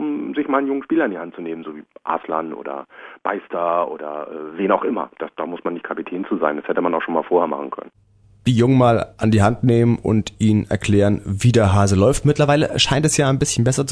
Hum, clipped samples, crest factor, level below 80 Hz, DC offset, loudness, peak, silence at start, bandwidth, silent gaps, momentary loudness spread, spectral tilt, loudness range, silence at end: none; under 0.1%; 16 dB; -44 dBFS; under 0.1%; -19 LUFS; -2 dBFS; 0 s; 11 kHz; none; 14 LU; -5.5 dB/octave; 8 LU; 0 s